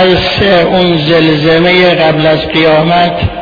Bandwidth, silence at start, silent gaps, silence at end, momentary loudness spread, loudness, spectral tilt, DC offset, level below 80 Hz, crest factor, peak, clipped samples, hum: 5.4 kHz; 0 s; none; 0 s; 3 LU; -7 LUFS; -7 dB/octave; under 0.1%; -30 dBFS; 8 dB; 0 dBFS; 0.3%; none